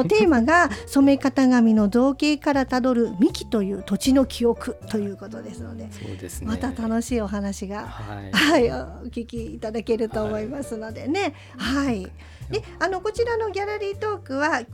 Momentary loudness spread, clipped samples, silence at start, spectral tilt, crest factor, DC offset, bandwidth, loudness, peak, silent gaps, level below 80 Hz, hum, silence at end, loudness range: 16 LU; under 0.1%; 0 s; -5 dB/octave; 18 dB; under 0.1%; 16.5 kHz; -23 LUFS; -6 dBFS; none; -42 dBFS; none; 0 s; 8 LU